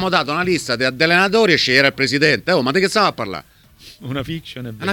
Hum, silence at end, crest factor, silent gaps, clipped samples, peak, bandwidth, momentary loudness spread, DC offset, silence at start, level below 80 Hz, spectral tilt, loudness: none; 0 s; 18 dB; none; under 0.1%; 0 dBFS; 19 kHz; 15 LU; under 0.1%; 0 s; -50 dBFS; -4 dB/octave; -16 LUFS